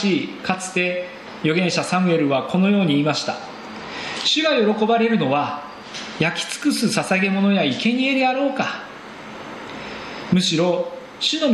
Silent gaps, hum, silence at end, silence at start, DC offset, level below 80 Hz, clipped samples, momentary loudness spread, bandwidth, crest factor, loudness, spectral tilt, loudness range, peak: none; none; 0 s; 0 s; under 0.1%; -60 dBFS; under 0.1%; 15 LU; 13 kHz; 18 dB; -20 LUFS; -4.5 dB/octave; 2 LU; -2 dBFS